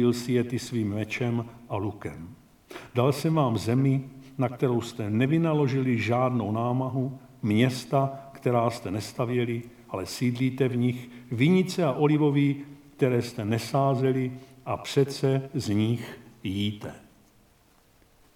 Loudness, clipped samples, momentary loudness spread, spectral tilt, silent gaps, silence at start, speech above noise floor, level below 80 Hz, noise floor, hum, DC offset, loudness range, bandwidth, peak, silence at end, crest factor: -27 LUFS; under 0.1%; 12 LU; -7 dB/octave; none; 0 s; 35 dB; -62 dBFS; -61 dBFS; none; under 0.1%; 4 LU; 15.5 kHz; -10 dBFS; 1.4 s; 18 dB